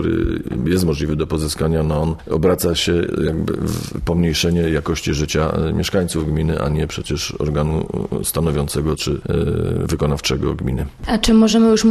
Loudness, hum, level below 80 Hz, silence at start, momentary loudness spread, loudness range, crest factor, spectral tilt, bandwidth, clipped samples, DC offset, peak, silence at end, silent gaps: -19 LUFS; none; -30 dBFS; 0 s; 6 LU; 2 LU; 18 dB; -5.5 dB/octave; 13.5 kHz; under 0.1%; under 0.1%; 0 dBFS; 0 s; none